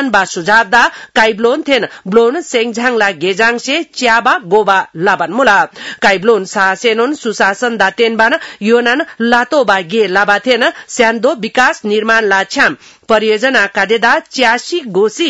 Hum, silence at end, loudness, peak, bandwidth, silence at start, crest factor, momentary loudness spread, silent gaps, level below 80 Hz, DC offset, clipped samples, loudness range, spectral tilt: none; 0 s; -11 LUFS; 0 dBFS; 11 kHz; 0 s; 12 dB; 4 LU; none; -52 dBFS; 0.2%; 0.4%; 1 LU; -3 dB/octave